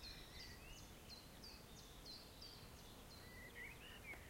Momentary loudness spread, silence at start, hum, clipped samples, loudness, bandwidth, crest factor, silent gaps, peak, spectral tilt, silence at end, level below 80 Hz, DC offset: 4 LU; 0 s; none; under 0.1%; -57 LUFS; 16.5 kHz; 14 dB; none; -44 dBFS; -3 dB/octave; 0 s; -64 dBFS; under 0.1%